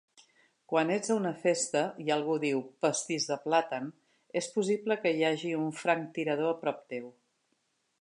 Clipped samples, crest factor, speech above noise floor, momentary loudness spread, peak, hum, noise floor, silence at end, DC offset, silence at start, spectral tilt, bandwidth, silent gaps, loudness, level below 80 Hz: under 0.1%; 20 dB; 46 dB; 9 LU; -12 dBFS; none; -77 dBFS; 0.9 s; under 0.1%; 0.7 s; -4 dB/octave; 11.5 kHz; none; -31 LUFS; -86 dBFS